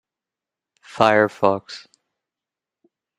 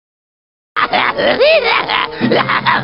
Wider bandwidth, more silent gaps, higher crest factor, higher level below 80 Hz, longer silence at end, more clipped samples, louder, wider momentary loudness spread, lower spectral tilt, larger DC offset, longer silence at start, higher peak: first, 12 kHz vs 5.8 kHz; neither; first, 24 dB vs 14 dB; second, -62 dBFS vs -50 dBFS; first, 1.4 s vs 0 s; neither; second, -18 LUFS vs -13 LUFS; first, 22 LU vs 6 LU; second, -5.5 dB/octave vs -7 dB/octave; second, under 0.1% vs 0.3%; first, 0.95 s vs 0.75 s; about the same, 0 dBFS vs 0 dBFS